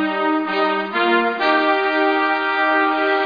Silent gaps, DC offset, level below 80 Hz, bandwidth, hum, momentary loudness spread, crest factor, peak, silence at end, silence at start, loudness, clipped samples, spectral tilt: none; under 0.1%; -66 dBFS; 5 kHz; none; 3 LU; 14 dB; -4 dBFS; 0 s; 0 s; -17 LUFS; under 0.1%; -5.5 dB/octave